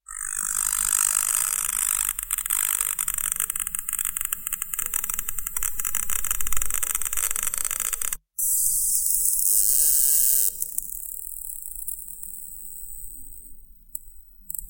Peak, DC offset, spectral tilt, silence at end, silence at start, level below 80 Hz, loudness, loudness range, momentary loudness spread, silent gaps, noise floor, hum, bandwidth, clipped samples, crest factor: -2 dBFS; under 0.1%; 2 dB/octave; 0 s; 0.1 s; -46 dBFS; -22 LUFS; 11 LU; 18 LU; none; -45 dBFS; none; 17 kHz; under 0.1%; 24 dB